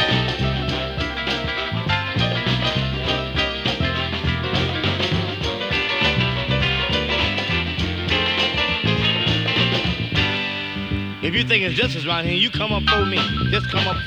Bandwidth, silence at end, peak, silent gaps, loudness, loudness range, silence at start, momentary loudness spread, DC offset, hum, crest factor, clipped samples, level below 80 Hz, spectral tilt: 9.6 kHz; 0 s; -4 dBFS; none; -20 LUFS; 2 LU; 0 s; 5 LU; under 0.1%; none; 18 dB; under 0.1%; -34 dBFS; -5.5 dB/octave